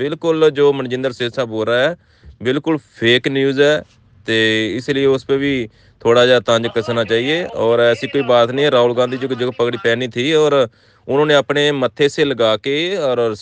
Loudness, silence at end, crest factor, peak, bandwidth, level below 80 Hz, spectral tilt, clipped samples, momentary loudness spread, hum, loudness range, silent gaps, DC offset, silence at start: -16 LUFS; 0 s; 16 dB; 0 dBFS; 9.4 kHz; -56 dBFS; -5 dB/octave; under 0.1%; 7 LU; none; 2 LU; none; under 0.1%; 0 s